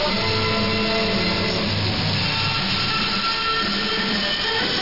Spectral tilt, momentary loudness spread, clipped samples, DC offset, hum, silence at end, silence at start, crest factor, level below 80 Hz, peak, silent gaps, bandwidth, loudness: -4.5 dB/octave; 1 LU; under 0.1%; under 0.1%; none; 0 s; 0 s; 12 dB; -40 dBFS; -10 dBFS; none; 5.8 kHz; -20 LUFS